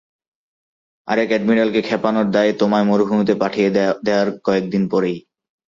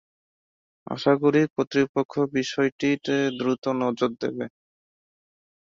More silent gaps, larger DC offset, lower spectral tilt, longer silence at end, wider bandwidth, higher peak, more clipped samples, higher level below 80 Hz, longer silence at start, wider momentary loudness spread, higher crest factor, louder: second, none vs 1.50-1.56 s, 1.89-1.94 s, 2.05-2.09 s, 2.72-2.79 s, 3.58-3.62 s; neither; about the same, -7 dB/octave vs -6 dB/octave; second, 0.5 s vs 1.2 s; about the same, 7.4 kHz vs 7.6 kHz; first, -2 dBFS vs -6 dBFS; neither; first, -58 dBFS vs -66 dBFS; first, 1.05 s vs 0.9 s; second, 4 LU vs 9 LU; about the same, 16 dB vs 20 dB; first, -18 LUFS vs -24 LUFS